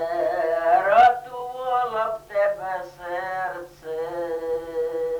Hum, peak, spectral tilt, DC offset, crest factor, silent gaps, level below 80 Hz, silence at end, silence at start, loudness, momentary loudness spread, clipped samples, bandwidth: none; -6 dBFS; -4.5 dB/octave; under 0.1%; 16 dB; none; -58 dBFS; 0 s; 0 s; -23 LUFS; 15 LU; under 0.1%; 19.5 kHz